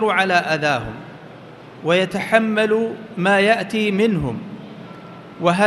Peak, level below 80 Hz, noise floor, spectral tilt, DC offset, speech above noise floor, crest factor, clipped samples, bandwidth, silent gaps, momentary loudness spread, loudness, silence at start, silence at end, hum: 0 dBFS; -50 dBFS; -39 dBFS; -5.5 dB/octave; under 0.1%; 21 dB; 20 dB; under 0.1%; 12 kHz; none; 22 LU; -18 LUFS; 0 s; 0 s; none